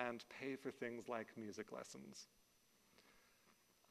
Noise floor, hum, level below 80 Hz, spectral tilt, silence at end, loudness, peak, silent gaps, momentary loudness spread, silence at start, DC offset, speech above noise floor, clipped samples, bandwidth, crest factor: -75 dBFS; none; -88 dBFS; -4.5 dB/octave; 0.35 s; -51 LUFS; -26 dBFS; none; 12 LU; 0 s; under 0.1%; 24 dB; under 0.1%; 13 kHz; 26 dB